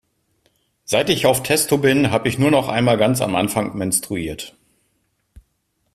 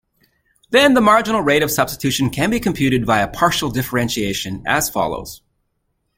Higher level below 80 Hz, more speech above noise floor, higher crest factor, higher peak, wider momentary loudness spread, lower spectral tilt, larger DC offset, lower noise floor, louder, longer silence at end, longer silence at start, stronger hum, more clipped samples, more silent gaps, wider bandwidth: second, -50 dBFS vs -44 dBFS; about the same, 51 dB vs 53 dB; about the same, 18 dB vs 18 dB; about the same, -2 dBFS vs 0 dBFS; about the same, 10 LU vs 9 LU; about the same, -4.5 dB/octave vs -4 dB/octave; neither; about the same, -69 dBFS vs -70 dBFS; about the same, -18 LUFS vs -17 LUFS; first, 1.45 s vs 0.8 s; first, 0.9 s vs 0.7 s; neither; neither; neither; about the same, 15.5 kHz vs 16.5 kHz